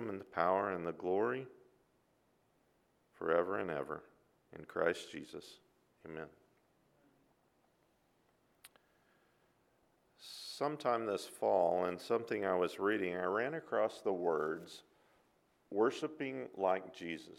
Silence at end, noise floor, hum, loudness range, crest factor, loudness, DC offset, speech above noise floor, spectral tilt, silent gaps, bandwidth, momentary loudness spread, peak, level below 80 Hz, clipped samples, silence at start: 0.05 s; -75 dBFS; none; 19 LU; 24 dB; -37 LUFS; under 0.1%; 38 dB; -5.5 dB/octave; none; 15 kHz; 17 LU; -16 dBFS; -80 dBFS; under 0.1%; 0 s